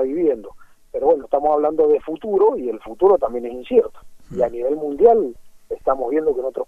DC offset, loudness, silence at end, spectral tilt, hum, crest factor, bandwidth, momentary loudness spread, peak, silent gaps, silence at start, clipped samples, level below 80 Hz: under 0.1%; -19 LUFS; 0.05 s; -8 dB/octave; none; 18 dB; 3.8 kHz; 13 LU; -2 dBFS; none; 0 s; under 0.1%; -48 dBFS